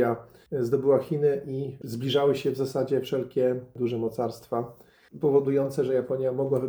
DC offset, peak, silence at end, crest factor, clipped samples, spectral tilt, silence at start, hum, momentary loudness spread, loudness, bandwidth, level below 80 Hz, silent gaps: under 0.1%; -10 dBFS; 0 s; 16 dB; under 0.1%; -7 dB/octave; 0 s; none; 10 LU; -27 LUFS; over 20 kHz; -66 dBFS; none